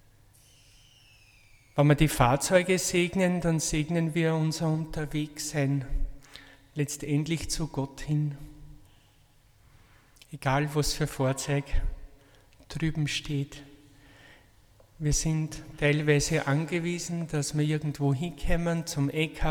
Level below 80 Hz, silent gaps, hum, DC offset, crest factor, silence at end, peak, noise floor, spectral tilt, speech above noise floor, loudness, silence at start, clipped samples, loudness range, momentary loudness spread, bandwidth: -40 dBFS; none; none; under 0.1%; 20 dB; 0 s; -8 dBFS; -60 dBFS; -5 dB/octave; 33 dB; -28 LUFS; 1.75 s; under 0.1%; 8 LU; 13 LU; 18 kHz